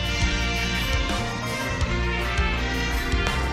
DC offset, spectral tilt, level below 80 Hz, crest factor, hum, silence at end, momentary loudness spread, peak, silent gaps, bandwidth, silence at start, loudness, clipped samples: under 0.1%; -4 dB/octave; -28 dBFS; 18 dB; none; 0 s; 3 LU; -8 dBFS; none; 15 kHz; 0 s; -25 LUFS; under 0.1%